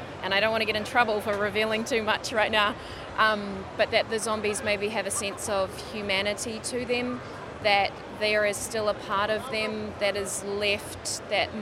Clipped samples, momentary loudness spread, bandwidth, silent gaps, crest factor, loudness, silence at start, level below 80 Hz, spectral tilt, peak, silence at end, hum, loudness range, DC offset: under 0.1%; 7 LU; 16 kHz; none; 20 dB; -27 LUFS; 0 s; -54 dBFS; -2.5 dB/octave; -8 dBFS; 0 s; none; 3 LU; under 0.1%